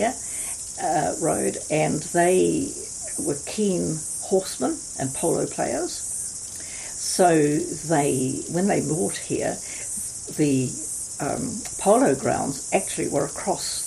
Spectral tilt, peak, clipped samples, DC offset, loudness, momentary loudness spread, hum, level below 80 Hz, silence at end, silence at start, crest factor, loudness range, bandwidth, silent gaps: -4 dB/octave; -6 dBFS; under 0.1%; under 0.1%; -24 LUFS; 9 LU; none; -54 dBFS; 0 s; 0 s; 18 dB; 3 LU; 15 kHz; none